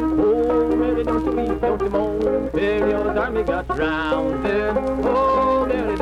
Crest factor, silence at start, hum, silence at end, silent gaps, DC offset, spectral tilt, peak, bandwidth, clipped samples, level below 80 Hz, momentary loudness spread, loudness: 12 dB; 0 s; none; 0 s; none; under 0.1%; -7.5 dB/octave; -8 dBFS; 10.5 kHz; under 0.1%; -36 dBFS; 4 LU; -20 LUFS